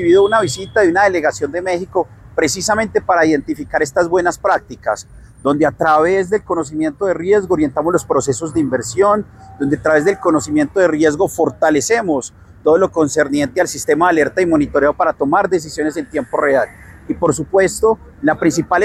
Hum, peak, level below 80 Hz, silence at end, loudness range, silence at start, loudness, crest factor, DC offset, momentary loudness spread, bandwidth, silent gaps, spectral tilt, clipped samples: none; -2 dBFS; -44 dBFS; 0 s; 2 LU; 0 s; -16 LUFS; 14 dB; under 0.1%; 7 LU; 15 kHz; none; -5 dB/octave; under 0.1%